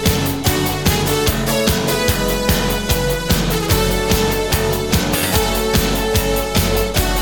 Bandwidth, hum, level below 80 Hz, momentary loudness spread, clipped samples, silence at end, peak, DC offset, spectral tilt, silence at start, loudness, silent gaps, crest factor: over 20 kHz; none; -24 dBFS; 1 LU; under 0.1%; 0 s; -2 dBFS; under 0.1%; -4 dB/octave; 0 s; -17 LUFS; none; 14 dB